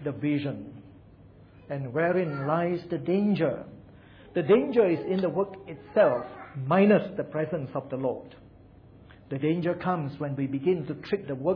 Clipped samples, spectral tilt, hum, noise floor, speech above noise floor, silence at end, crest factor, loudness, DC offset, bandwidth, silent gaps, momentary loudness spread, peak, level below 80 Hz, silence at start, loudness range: under 0.1%; -10.5 dB/octave; none; -52 dBFS; 26 dB; 0 s; 18 dB; -27 LUFS; under 0.1%; 5.4 kHz; none; 14 LU; -10 dBFS; -62 dBFS; 0 s; 6 LU